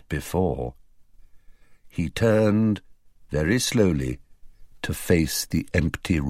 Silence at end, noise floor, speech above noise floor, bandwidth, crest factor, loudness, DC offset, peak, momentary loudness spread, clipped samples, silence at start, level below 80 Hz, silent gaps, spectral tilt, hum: 0 s; -51 dBFS; 28 dB; 16 kHz; 20 dB; -24 LUFS; 0.2%; -6 dBFS; 12 LU; under 0.1%; 0.1 s; -40 dBFS; none; -5.5 dB/octave; none